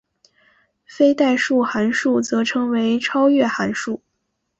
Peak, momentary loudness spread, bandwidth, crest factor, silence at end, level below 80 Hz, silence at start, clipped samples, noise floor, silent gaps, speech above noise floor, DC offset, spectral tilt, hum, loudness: -4 dBFS; 7 LU; 8.2 kHz; 16 dB; 0.65 s; -62 dBFS; 0.9 s; under 0.1%; -74 dBFS; none; 56 dB; under 0.1%; -4.5 dB/octave; none; -18 LUFS